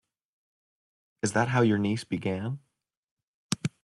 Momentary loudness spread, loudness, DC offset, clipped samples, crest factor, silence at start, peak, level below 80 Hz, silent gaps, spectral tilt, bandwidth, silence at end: 11 LU; -28 LUFS; under 0.1%; under 0.1%; 24 dB; 1.25 s; -8 dBFS; -66 dBFS; 2.97-3.17 s, 3.23-3.50 s; -5.5 dB/octave; 12 kHz; 0.15 s